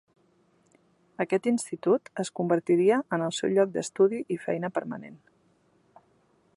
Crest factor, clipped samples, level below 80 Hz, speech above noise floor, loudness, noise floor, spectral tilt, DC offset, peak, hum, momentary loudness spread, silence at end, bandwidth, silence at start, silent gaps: 18 dB; under 0.1%; -76 dBFS; 39 dB; -27 LUFS; -66 dBFS; -5.5 dB/octave; under 0.1%; -10 dBFS; none; 11 LU; 1.4 s; 11.5 kHz; 1.2 s; none